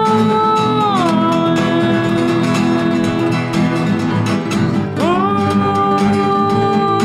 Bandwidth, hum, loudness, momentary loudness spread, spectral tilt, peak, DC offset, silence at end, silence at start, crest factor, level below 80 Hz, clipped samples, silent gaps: 14 kHz; none; -15 LUFS; 3 LU; -6.5 dB/octave; -4 dBFS; under 0.1%; 0 s; 0 s; 10 dB; -46 dBFS; under 0.1%; none